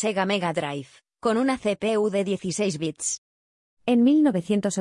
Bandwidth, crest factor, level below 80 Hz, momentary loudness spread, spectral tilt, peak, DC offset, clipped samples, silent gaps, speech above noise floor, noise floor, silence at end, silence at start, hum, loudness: 11.5 kHz; 14 dB; -64 dBFS; 10 LU; -4.5 dB/octave; -10 dBFS; under 0.1%; under 0.1%; 3.18-3.77 s; over 67 dB; under -90 dBFS; 0 s; 0 s; none; -24 LUFS